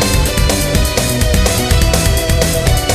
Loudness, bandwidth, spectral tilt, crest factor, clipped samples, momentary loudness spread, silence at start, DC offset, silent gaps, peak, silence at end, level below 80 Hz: -13 LUFS; 15.5 kHz; -4 dB/octave; 12 dB; under 0.1%; 1 LU; 0 s; under 0.1%; none; 0 dBFS; 0 s; -16 dBFS